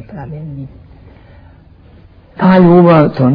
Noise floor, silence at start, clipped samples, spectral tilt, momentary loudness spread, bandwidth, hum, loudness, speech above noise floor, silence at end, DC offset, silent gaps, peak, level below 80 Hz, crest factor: -41 dBFS; 0.1 s; under 0.1%; -11 dB/octave; 22 LU; 5.2 kHz; none; -8 LUFS; 31 dB; 0 s; under 0.1%; none; 0 dBFS; -42 dBFS; 12 dB